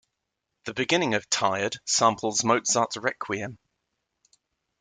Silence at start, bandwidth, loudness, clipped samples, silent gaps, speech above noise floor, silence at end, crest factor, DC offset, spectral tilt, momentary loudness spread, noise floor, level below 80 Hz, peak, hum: 0.65 s; 10.5 kHz; -25 LUFS; under 0.1%; none; 56 dB; 1.25 s; 22 dB; under 0.1%; -2.5 dB/octave; 10 LU; -82 dBFS; -68 dBFS; -6 dBFS; none